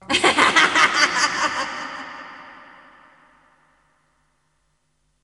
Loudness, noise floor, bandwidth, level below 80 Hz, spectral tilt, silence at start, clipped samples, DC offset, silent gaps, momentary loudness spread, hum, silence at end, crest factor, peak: -17 LUFS; -69 dBFS; 11.5 kHz; -60 dBFS; -1 dB/octave; 0.1 s; under 0.1%; under 0.1%; none; 22 LU; none; 2.65 s; 22 dB; 0 dBFS